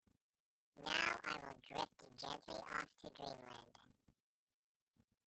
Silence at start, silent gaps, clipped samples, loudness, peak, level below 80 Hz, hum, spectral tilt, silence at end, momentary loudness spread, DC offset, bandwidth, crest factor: 0.75 s; none; under 0.1%; -46 LUFS; -22 dBFS; -78 dBFS; none; -2.5 dB/octave; 1.4 s; 15 LU; under 0.1%; 8.4 kHz; 28 dB